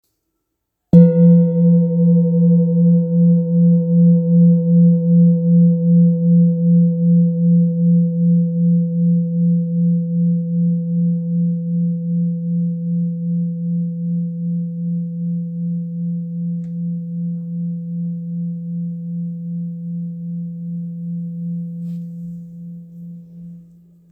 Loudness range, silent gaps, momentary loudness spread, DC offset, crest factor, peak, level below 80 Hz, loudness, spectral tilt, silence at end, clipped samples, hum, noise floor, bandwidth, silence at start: 13 LU; none; 14 LU; under 0.1%; 16 dB; 0 dBFS; -60 dBFS; -16 LUFS; -15 dB/octave; 0.5 s; under 0.1%; none; -75 dBFS; 1 kHz; 0.95 s